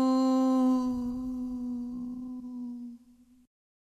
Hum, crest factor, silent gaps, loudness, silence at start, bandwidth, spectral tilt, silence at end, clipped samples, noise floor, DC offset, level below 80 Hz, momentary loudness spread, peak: none; 14 dB; none; -30 LUFS; 0 s; 8.2 kHz; -6 dB/octave; 0.9 s; under 0.1%; -59 dBFS; under 0.1%; -58 dBFS; 15 LU; -18 dBFS